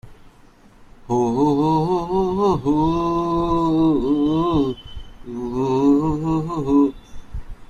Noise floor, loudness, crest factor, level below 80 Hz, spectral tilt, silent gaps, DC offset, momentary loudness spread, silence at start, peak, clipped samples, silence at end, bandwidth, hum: -49 dBFS; -19 LUFS; 14 dB; -38 dBFS; -8.5 dB/octave; none; under 0.1%; 16 LU; 0.05 s; -6 dBFS; under 0.1%; 0.05 s; 8.2 kHz; none